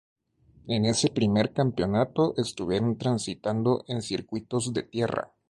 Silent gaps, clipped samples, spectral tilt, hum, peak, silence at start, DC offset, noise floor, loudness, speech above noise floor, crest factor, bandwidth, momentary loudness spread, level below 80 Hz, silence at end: none; under 0.1%; -5.5 dB/octave; none; -10 dBFS; 0.65 s; under 0.1%; -60 dBFS; -27 LUFS; 33 dB; 16 dB; 11.5 kHz; 7 LU; -56 dBFS; 0.25 s